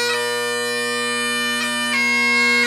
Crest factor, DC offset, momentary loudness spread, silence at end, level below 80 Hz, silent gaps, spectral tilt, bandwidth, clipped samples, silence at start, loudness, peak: 12 dB; under 0.1%; 6 LU; 0 s; -76 dBFS; none; -1 dB/octave; 15.5 kHz; under 0.1%; 0 s; -18 LUFS; -6 dBFS